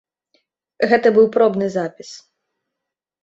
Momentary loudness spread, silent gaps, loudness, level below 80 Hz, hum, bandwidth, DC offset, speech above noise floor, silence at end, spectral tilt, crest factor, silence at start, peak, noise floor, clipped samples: 19 LU; none; -16 LUFS; -64 dBFS; none; 7.8 kHz; under 0.1%; 67 dB; 1.05 s; -6 dB/octave; 18 dB; 0.8 s; -2 dBFS; -83 dBFS; under 0.1%